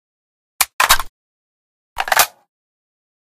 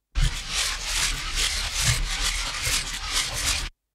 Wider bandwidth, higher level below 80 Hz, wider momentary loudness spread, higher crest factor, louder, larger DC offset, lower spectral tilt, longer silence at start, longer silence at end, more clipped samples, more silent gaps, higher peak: first, over 20 kHz vs 16 kHz; second, -40 dBFS vs -32 dBFS; first, 11 LU vs 3 LU; about the same, 22 dB vs 18 dB; first, -16 LUFS vs -25 LUFS; neither; second, 1.5 dB/octave vs -1 dB/octave; first, 0.6 s vs 0.15 s; first, 1.1 s vs 0.25 s; neither; first, 0.73-0.79 s, 1.09-1.96 s vs none; first, 0 dBFS vs -8 dBFS